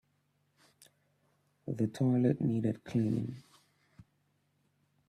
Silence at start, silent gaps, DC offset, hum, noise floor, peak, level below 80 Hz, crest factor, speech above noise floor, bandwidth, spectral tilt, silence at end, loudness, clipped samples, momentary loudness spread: 1.65 s; none; under 0.1%; none; -76 dBFS; -16 dBFS; -70 dBFS; 20 dB; 45 dB; 12.5 kHz; -9 dB/octave; 1.7 s; -33 LUFS; under 0.1%; 14 LU